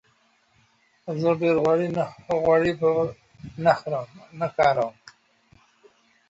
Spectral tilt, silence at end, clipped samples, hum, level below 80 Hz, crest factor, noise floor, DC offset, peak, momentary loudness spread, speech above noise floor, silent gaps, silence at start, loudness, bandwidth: -7 dB/octave; 1.4 s; under 0.1%; none; -58 dBFS; 20 dB; -64 dBFS; under 0.1%; -6 dBFS; 13 LU; 41 dB; none; 1.05 s; -23 LUFS; 8 kHz